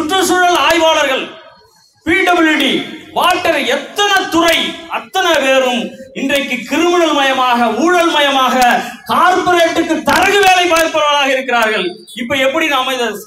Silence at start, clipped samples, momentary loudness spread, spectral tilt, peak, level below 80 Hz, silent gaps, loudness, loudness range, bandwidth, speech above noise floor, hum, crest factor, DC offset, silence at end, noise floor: 0 s; under 0.1%; 8 LU; -2 dB/octave; 0 dBFS; -48 dBFS; none; -12 LUFS; 3 LU; 16 kHz; 36 dB; none; 12 dB; under 0.1%; 0 s; -48 dBFS